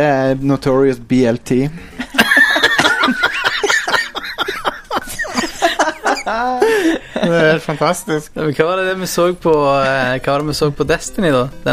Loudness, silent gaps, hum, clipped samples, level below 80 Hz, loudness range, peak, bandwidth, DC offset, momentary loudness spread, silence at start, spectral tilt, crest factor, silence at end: -15 LUFS; none; none; under 0.1%; -40 dBFS; 4 LU; 0 dBFS; 15.5 kHz; under 0.1%; 9 LU; 0 s; -4.5 dB/octave; 16 dB; 0 s